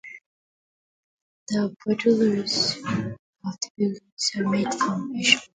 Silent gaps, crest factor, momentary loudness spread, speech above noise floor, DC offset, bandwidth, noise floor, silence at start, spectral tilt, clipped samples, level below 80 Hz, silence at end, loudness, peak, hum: 0.26-1.46 s, 3.19-3.33 s, 3.70-3.75 s, 4.12-4.17 s; 24 dB; 12 LU; over 66 dB; under 0.1%; 9.6 kHz; under -90 dBFS; 0.05 s; -3.5 dB/octave; under 0.1%; -64 dBFS; 0.15 s; -24 LUFS; -2 dBFS; none